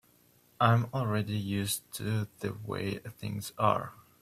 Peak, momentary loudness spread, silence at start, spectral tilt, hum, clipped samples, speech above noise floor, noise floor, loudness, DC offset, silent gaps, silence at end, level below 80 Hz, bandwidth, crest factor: -10 dBFS; 12 LU; 0.6 s; -5.5 dB/octave; none; under 0.1%; 33 dB; -64 dBFS; -32 LUFS; under 0.1%; none; 0.2 s; -64 dBFS; 16 kHz; 22 dB